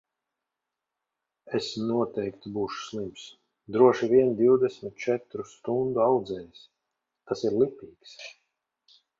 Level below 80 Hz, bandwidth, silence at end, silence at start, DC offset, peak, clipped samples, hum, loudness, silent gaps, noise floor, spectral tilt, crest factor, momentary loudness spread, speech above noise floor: -66 dBFS; 7.6 kHz; 0.9 s; 1.45 s; under 0.1%; -6 dBFS; under 0.1%; none; -26 LUFS; none; -87 dBFS; -6.5 dB/octave; 22 dB; 22 LU; 60 dB